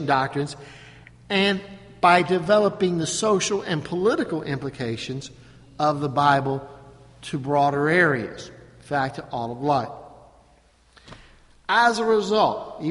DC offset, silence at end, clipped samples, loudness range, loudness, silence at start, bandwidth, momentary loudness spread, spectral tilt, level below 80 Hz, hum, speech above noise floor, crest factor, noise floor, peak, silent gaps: under 0.1%; 0 s; under 0.1%; 4 LU; -22 LUFS; 0 s; 11.5 kHz; 17 LU; -4.5 dB/octave; -56 dBFS; none; 35 dB; 20 dB; -57 dBFS; -2 dBFS; none